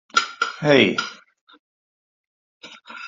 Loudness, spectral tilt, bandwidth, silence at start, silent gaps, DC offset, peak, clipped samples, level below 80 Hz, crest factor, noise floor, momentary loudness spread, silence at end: -19 LUFS; -4 dB/octave; 8 kHz; 0.15 s; 1.41-1.47 s, 1.59-2.60 s; under 0.1%; -2 dBFS; under 0.1%; -64 dBFS; 22 dB; under -90 dBFS; 17 LU; 0 s